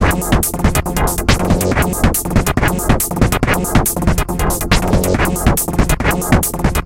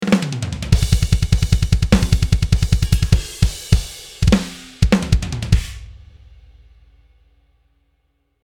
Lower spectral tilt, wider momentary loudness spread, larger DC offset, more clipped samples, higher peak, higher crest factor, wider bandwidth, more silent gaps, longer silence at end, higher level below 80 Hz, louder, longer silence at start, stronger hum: about the same, -4.5 dB/octave vs -5.5 dB/octave; second, 2 LU vs 6 LU; neither; neither; about the same, 0 dBFS vs 0 dBFS; about the same, 14 dB vs 18 dB; about the same, 17 kHz vs 17.5 kHz; neither; second, 0 s vs 2.55 s; about the same, -20 dBFS vs -22 dBFS; first, -15 LUFS vs -18 LUFS; about the same, 0 s vs 0 s; neither